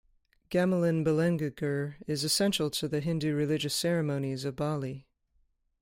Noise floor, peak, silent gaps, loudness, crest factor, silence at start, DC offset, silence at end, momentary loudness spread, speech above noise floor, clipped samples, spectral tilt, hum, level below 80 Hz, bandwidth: -71 dBFS; -14 dBFS; none; -30 LUFS; 16 dB; 0.5 s; under 0.1%; 0.8 s; 8 LU; 42 dB; under 0.1%; -5 dB/octave; none; -62 dBFS; 16.5 kHz